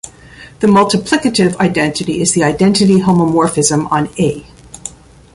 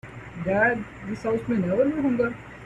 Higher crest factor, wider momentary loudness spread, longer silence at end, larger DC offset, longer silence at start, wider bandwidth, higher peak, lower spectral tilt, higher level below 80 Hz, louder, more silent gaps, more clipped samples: about the same, 12 dB vs 16 dB; first, 18 LU vs 10 LU; first, 0.45 s vs 0 s; neither; about the same, 0.05 s vs 0.05 s; first, 11.5 kHz vs 10 kHz; first, 0 dBFS vs -10 dBFS; second, -5 dB/octave vs -8 dB/octave; first, -44 dBFS vs -50 dBFS; first, -12 LUFS vs -25 LUFS; neither; neither